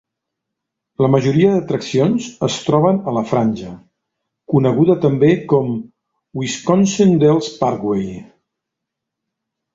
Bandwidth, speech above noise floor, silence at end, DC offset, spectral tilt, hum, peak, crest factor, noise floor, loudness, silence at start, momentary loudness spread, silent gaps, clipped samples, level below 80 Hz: 8 kHz; 65 dB; 1.5 s; under 0.1%; -6.5 dB/octave; none; -2 dBFS; 16 dB; -81 dBFS; -16 LUFS; 1 s; 12 LU; none; under 0.1%; -52 dBFS